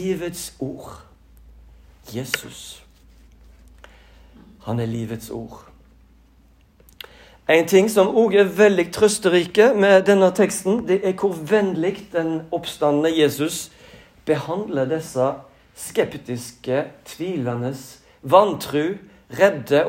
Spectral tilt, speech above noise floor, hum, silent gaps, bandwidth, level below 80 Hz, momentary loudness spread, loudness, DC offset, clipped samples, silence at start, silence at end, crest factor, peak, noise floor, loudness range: -5 dB/octave; 34 dB; none; none; 16 kHz; -54 dBFS; 20 LU; -20 LUFS; under 0.1%; under 0.1%; 0 s; 0 s; 20 dB; 0 dBFS; -54 dBFS; 16 LU